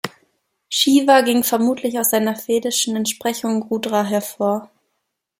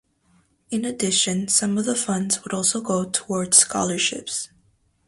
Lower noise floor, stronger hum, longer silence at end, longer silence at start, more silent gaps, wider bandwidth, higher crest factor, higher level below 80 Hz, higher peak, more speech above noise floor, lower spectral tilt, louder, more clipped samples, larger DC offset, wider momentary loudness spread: first, -75 dBFS vs -63 dBFS; neither; first, 0.75 s vs 0.6 s; second, 0.05 s vs 0.7 s; neither; first, 16.5 kHz vs 11.5 kHz; about the same, 18 dB vs 22 dB; about the same, -66 dBFS vs -62 dBFS; about the same, -2 dBFS vs 0 dBFS; first, 57 dB vs 40 dB; about the same, -3 dB/octave vs -2.5 dB/octave; first, -18 LUFS vs -21 LUFS; neither; neither; second, 9 LU vs 13 LU